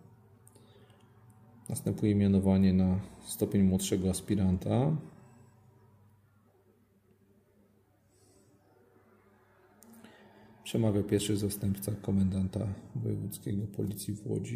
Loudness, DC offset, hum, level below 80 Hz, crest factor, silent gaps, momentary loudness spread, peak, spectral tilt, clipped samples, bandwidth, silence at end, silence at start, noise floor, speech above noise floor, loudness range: -31 LUFS; under 0.1%; none; -60 dBFS; 18 dB; none; 11 LU; -14 dBFS; -6.5 dB/octave; under 0.1%; 15.5 kHz; 0 s; 1.7 s; -67 dBFS; 37 dB; 8 LU